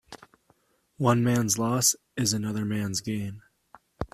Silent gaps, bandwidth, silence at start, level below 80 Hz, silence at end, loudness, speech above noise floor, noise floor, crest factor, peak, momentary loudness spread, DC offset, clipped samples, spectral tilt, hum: none; 15 kHz; 0.1 s; -56 dBFS; 0.1 s; -26 LUFS; 41 dB; -67 dBFS; 22 dB; -8 dBFS; 11 LU; under 0.1%; under 0.1%; -4 dB/octave; none